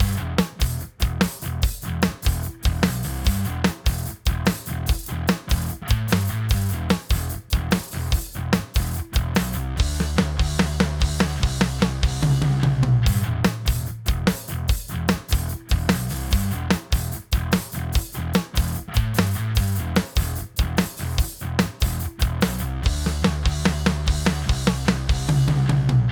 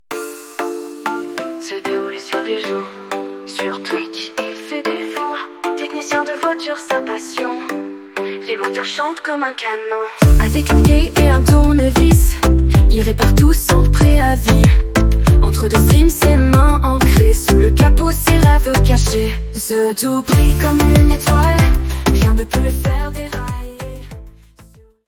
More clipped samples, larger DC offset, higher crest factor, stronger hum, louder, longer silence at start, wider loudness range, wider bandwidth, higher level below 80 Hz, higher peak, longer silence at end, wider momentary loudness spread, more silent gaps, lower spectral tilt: neither; neither; first, 22 dB vs 14 dB; neither; second, -23 LUFS vs -15 LUFS; about the same, 0 s vs 0.1 s; second, 3 LU vs 11 LU; first, over 20 kHz vs 18 kHz; second, -26 dBFS vs -16 dBFS; about the same, 0 dBFS vs 0 dBFS; second, 0 s vs 0.75 s; second, 5 LU vs 13 LU; neither; about the same, -5.5 dB/octave vs -6 dB/octave